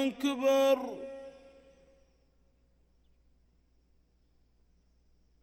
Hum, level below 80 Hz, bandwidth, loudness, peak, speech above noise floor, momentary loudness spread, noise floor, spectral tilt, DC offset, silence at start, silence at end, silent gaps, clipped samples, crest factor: 60 Hz at -70 dBFS; -70 dBFS; 16.5 kHz; -29 LUFS; -16 dBFS; 40 dB; 21 LU; -69 dBFS; -3.5 dB/octave; under 0.1%; 0 s; 4.15 s; none; under 0.1%; 20 dB